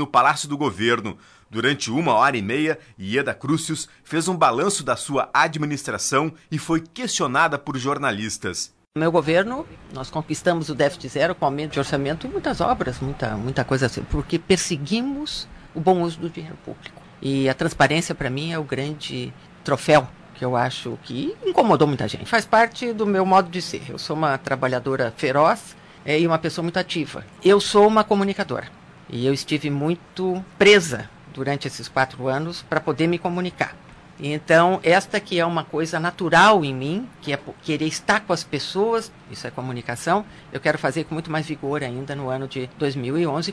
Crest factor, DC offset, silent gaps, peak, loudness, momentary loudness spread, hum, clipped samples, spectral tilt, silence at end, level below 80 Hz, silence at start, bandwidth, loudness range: 18 dB; under 0.1%; none; -4 dBFS; -22 LUFS; 13 LU; none; under 0.1%; -4.5 dB/octave; 0 s; -48 dBFS; 0 s; 11 kHz; 4 LU